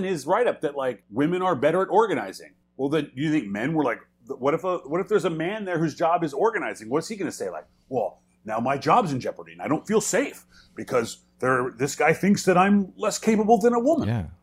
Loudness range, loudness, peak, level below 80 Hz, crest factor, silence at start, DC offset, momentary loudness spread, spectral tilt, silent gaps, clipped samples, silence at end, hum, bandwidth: 5 LU; -24 LUFS; -6 dBFS; -60 dBFS; 18 dB; 0 s; under 0.1%; 12 LU; -5.5 dB/octave; none; under 0.1%; 0.1 s; none; 16 kHz